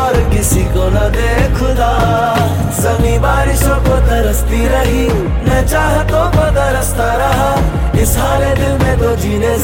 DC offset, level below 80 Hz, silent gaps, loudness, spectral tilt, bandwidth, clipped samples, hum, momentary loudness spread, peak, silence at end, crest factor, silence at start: under 0.1%; -16 dBFS; none; -13 LUFS; -5.5 dB/octave; 17 kHz; under 0.1%; none; 2 LU; 0 dBFS; 0 s; 10 dB; 0 s